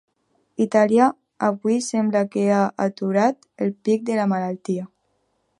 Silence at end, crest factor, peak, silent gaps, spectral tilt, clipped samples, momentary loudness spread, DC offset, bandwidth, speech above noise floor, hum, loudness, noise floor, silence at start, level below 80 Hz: 0.75 s; 18 dB; -2 dBFS; none; -6.5 dB/octave; under 0.1%; 10 LU; under 0.1%; 11.5 kHz; 49 dB; none; -21 LUFS; -69 dBFS; 0.6 s; -72 dBFS